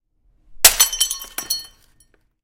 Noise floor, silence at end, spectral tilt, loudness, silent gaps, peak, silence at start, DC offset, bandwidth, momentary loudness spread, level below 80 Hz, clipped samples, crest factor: -59 dBFS; 0.75 s; 2 dB/octave; -16 LUFS; none; 0 dBFS; 0.5 s; under 0.1%; 17 kHz; 14 LU; -44 dBFS; 0.2%; 22 dB